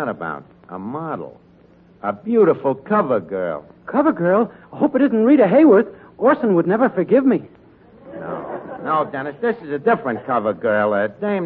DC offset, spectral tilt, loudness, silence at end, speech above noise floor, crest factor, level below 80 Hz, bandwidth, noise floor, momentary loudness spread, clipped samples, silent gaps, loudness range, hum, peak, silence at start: under 0.1%; -11 dB/octave; -18 LUFS; 0 s; 32 dB; 16 dB; -62 dBFS; 4.4 kHz; -50 dBFS; 16 LU; under 0.1%; none; 6 LU; none; -4 dBFS; 0 s